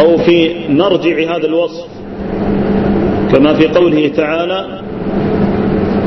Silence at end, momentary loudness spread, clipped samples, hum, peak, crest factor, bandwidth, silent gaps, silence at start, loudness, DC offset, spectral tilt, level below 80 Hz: 0 s; 11 LU; under 0.1%; none; 0 dBFS; 12 dB; 6.2 kHz; none; 0 s; -12 LUFS; under 0.1%; -8 dB/octave; -32 dBFS